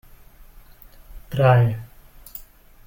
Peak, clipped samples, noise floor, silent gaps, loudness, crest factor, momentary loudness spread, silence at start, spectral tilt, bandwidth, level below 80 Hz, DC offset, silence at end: -6 dBFS; under 0.1%; -46 dBFS; none; -19 LUFS; 18 dB; 23 LU; 1.1 s; -8 dB/octave; 17 kHz; -46 dBFS; under 0.1%; 0.45 s